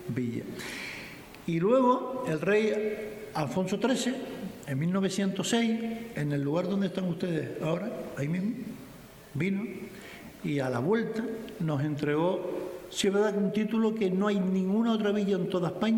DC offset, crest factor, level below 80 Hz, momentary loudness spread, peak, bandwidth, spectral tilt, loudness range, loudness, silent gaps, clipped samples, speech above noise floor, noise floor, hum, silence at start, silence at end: under 0.1%; 16 dB; -64 dBFS; 12 LU; -12 dBFS; 19.5 kHz; -6 dB/octave; 5 LU; -30 LUFS; none; under 0.1%; 21 dB; -49 dBFS; none; 0 s; 0 s